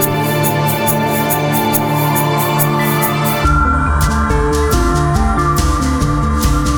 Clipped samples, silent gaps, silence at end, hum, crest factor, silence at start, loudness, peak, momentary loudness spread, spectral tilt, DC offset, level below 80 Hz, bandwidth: under 0.1%; none; 0 s; none; 12 dB; 0 s; -14 LUFS; 0 dBFS; 1 LU; -5 dB/octave; under 0.1%; -20 dBFS; over 20 kHz